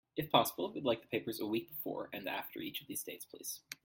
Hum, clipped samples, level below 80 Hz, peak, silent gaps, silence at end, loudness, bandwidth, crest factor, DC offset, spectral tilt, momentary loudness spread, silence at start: none; under 0.1%; -74 dBFS; -12 dBFS; none; 0.1 s; -38 LUFS; 17 kHz; 26 dB; under 0.1%; -3.5 dB/octave; 12 LU; 0.15 s